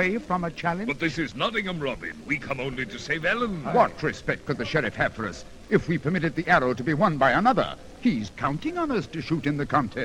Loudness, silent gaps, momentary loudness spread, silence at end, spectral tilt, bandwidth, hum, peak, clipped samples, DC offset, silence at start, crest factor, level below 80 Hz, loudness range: -26 LUFS; none; 9 LU; 0 s; -6 dB/octave; 16 kHz; none; -4 dBFS; under 0.1%; 0.1%; 0 s; 22 dB; -48 dBFS; 4 LU